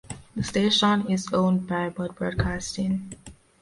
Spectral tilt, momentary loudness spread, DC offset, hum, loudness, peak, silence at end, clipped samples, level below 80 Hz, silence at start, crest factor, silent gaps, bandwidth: -5 dB/octave; 12 LU; under 0.1%; none; -25 LUFS; -8 dBFS; 0.3 s; under 0.1%; -44 dBFS; 0.05 s; 16 dB; none; 11.5 kHz